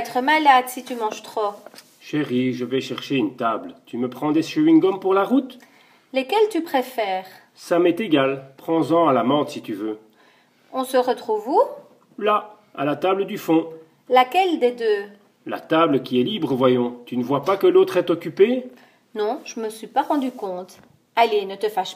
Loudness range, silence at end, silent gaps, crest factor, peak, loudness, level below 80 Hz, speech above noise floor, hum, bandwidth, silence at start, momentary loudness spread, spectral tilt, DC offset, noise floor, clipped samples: 4 LU; 0 s; none; 18 dB; -2 dBFS; -21 LUFS; -76 dBFS; 36 dB; none; 15.5 kHz; 0 s; 14 LU; -5.5 dB/octave; under 0.1%; -56 dBFS; under 0.1%